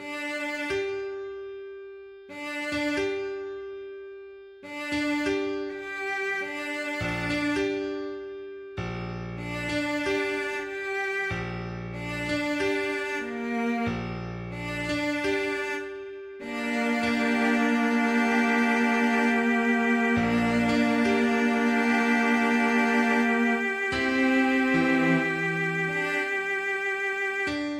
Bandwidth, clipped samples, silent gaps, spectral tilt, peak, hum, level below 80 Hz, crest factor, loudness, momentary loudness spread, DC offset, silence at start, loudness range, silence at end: 14.5 kHz; under 0.1%; none; -5 dB/octave; -10 dBFS; none; -54 dBFS; 16 dB; -26 LUFS; 15 LU; under 0.1%; 0 s; 8 LU; 0 s